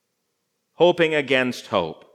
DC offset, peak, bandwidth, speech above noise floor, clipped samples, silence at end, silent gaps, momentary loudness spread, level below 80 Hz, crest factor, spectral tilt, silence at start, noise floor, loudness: under 0.1%; -4 dBFS; 13.5 kHz; 54 dB; under 0.1%; 0.2 s; none; 7 LU; -70 dBFS; 20 dB; -5 dB/octave; 0.8 s; -75 dBFS; -20 LUFS